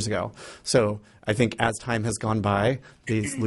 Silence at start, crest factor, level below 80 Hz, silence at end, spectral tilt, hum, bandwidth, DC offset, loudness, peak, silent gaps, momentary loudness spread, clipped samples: 0 s; 22 dB; -52 dBFS; 0 s; -5 dB/octave; none; 11.5 kHz; under 0.1%; -26 LUFS; -4 dBFS; none; 10 LU; under 0.1%